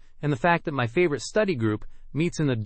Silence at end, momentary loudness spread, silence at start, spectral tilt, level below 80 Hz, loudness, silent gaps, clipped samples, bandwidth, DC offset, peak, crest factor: 0 s; 6 LU; 0.15 s; -6 dB/octave; -46 dBFS; -25 LUFS; none; under 0.1%; 8.8 kHz; under 0.1%; -8 dBFS; 18 dB